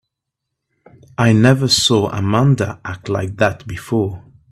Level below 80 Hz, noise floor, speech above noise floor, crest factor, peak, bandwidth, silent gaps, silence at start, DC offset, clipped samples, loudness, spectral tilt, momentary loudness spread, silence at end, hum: -48 dBFS; -79 dBFS; 63 dB; 16 dB; 0 dBFS; 13.5 kHz; none; 1.2 s; under 0.1%; under 0.1%; -16 LUFS; -5 dB/octave; 15 LU; 0.3 s; none